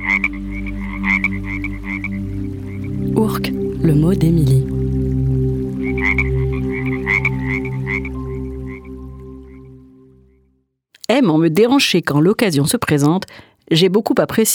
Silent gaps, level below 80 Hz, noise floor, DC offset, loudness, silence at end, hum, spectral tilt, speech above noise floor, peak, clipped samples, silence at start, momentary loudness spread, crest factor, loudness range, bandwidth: none; -30 dBFS; -62 dBFS; under 0.1%; -17 LUFS; 0 s; none; -5.5 dB/octave; 48 dB; -2 dBFS; under 0.1%; 0 s; 13 LU; 16 dB; 8 LU; over 20 kHz